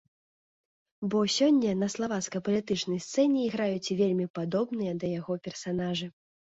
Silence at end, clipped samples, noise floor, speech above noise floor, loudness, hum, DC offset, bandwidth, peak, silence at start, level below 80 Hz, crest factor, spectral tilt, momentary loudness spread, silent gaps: 0.35 s; under 0.1%; under -90 dBFS; over 62 dB; -29 LUFS; none; under 0.1%; 8 kHz; -14 dBFS; 1 s; -66 dBFS; 16 dB; -5 dB/octave; 10 LU; 4.30-4.34 s